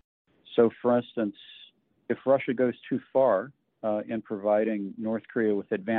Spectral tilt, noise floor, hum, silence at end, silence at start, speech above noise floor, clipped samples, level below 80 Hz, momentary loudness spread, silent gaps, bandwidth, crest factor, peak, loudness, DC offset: -5.5 dB/octave; -50 dBFS; none; 0 s; 0.5 s; 23 dB; under 0.1%; -74 dBFS; 10 LU; none; 4.1 kHz; 18 dB; -10 dBFS; -28 LUFS; under 0.1%